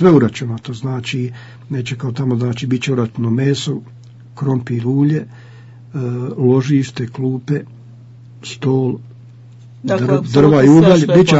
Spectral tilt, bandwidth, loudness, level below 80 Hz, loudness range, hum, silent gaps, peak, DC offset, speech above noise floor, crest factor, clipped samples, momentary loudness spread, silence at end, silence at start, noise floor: -7 dB/octave; 8 kHz; -16 LUFS; -52 dBFS; 6 LU; none; none; 0 dBFS; under 0.1%; 24 dB; 14 dB; under 0.1%; 16 LU; 0 s; 0 s; -39 dBFS